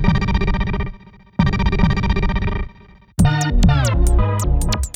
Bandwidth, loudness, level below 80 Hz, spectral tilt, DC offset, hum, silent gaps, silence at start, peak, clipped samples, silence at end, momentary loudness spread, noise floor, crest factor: 15 kHz; -19 LUFS; -20 dBFS; -6 dB/octave; under 0.1%; none; none; 0 s; -2 dBFS; under 0.1%; 0.05 s; 12 LU; -45 dBFS; 14 dB